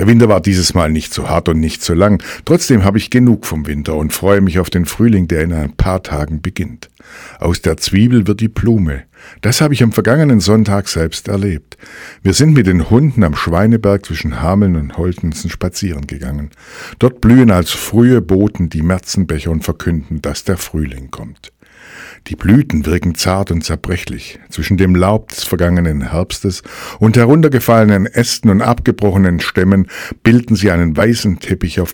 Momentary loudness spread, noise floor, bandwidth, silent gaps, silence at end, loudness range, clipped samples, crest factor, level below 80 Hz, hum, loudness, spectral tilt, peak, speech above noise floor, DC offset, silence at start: 12 LU; -37 dBFS; 19 kHz; none; 0 s; 5 LU; 0.5%; 12 dB; -28 dBFS; none; -13 LUFS; -6 dB/octave; 0 dBFS; 24 dB; under 0.1%; 0 s